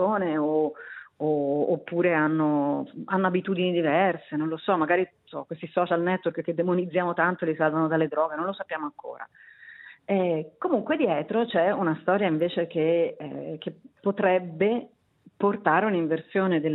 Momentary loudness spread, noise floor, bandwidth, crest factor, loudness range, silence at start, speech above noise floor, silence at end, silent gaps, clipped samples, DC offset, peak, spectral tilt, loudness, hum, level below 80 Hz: 13 LU; -48 dBFS; 4.1 kHz; 18 dB; 3 LU; 0 s; 23 dB; 0 s; none; under 0.1%; under 0.1%; -8 dBFS; -10.5 dB/octave; -26 LUFS; none; -76 dBFS